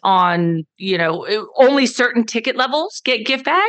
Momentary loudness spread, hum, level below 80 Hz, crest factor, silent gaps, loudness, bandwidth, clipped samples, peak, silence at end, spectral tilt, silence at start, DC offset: 8 LU; none; -80 dBFS; 16 dB; none; -17 LUFS; 9 kHz; under 0.1%; 0 dBFS; 0 s; -4.5 dB/octave; 0.05 s; under 0.1%